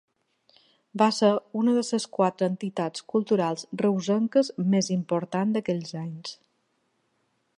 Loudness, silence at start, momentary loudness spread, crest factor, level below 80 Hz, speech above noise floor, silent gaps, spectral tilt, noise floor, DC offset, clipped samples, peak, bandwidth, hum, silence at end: -26 LUFS; 0.95 s; 9 LU; 20 dB; -76 dBFS; 47 dB; none; -6 dB/octave; -73 dBFS; under 0.1%; under 0.1%; -8 dBFS; 11 kHz; none; 1.25 s